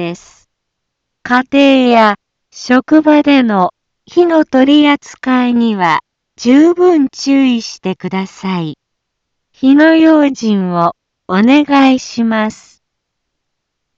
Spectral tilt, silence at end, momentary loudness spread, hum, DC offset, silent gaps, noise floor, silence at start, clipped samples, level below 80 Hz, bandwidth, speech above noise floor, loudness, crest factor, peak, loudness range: -5.5 dB/octave; 1.45 s; 12 LU; none; under 0.1%; none; -73 dBFS; 0 s; under 0.1%; -56 dBFS; 7.6 kHz; 63 dB; -11 LUFS; 12 dB; 0 dBFS; 3 LU